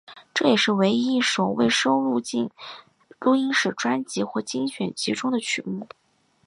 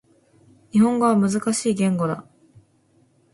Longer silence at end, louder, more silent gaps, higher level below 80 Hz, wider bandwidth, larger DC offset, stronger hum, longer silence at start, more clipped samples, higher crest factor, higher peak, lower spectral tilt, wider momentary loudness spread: second, 0.6 s vs 1.1 s; second, -23 LUFS vs -20 LUFS; neither; second, -68 dBFS vs -62 dBFS; about the same, 11 kHz vs 11.5 kHz; neither; neither; second, 0.1 s vs 0.75 s; neither; about the same, 18 dB vs 16 dB; about the same, -6 dBFS vs -6 dBFS; second, -4 dB/octave vs -6 dB/octave; first, 11 LU vs 8 LU